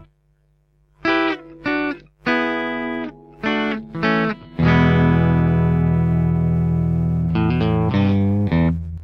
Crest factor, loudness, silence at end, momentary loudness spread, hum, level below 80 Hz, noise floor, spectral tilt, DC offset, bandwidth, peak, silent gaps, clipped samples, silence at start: 14 dB; -19 LUFS; 0 s; 9 LU; none; -34 dBFS; -60 dBFS; -9 dB/octave; under 0.1%; 6 kHz; -4 dBFS; none; under 0.1%; 1.05 s